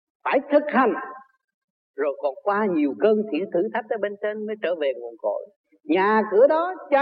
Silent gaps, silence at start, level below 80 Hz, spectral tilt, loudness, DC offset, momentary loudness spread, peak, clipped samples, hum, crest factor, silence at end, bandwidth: 1.44-1.48 s, 1.54-1.94 s, 5.56-5.64 s; 0.25 s; -78 dBFS; -9.5 dB/octave; -23 LUFS; under 0.1%; 10 LU; -6 dBFS; under 0.1%; none; 16 dB; 0 s; 5.2 kHz